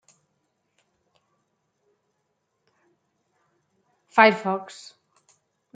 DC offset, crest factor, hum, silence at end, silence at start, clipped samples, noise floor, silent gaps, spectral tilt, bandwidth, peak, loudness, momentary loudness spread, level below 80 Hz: under 0.1%; 28 dB; none; 1.1 s; 4.15 s; under 0.1%; -76 dBFS; none; -5 dB/octave; 9.2 kHz; -2 dBFS; -20 LUFS; 25 LU; -82 dBFS